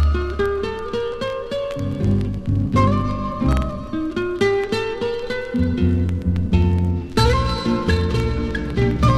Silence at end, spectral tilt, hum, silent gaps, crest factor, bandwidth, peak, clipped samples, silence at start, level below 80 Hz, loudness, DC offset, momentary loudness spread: 0 s; -7 dB/octave; none; none; 16 dB; 12.5 kHz; -4 dBFS; under 0.1%; 0 s; -26 dBFS; -21 LUFS; under 0.1%; 7 LU